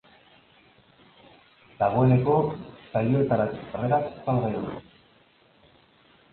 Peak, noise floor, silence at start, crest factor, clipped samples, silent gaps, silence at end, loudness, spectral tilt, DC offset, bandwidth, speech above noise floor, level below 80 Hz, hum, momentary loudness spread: -8 dBFS; -60 dBFS; 1.8 s; 20 dB; under 0.1%; none; 1.55 s; -25 LUFS; -12.5 dB/octave; under 0.1%; 4.3 kHz; 36 dB; -56 dBFS; none; 12 LU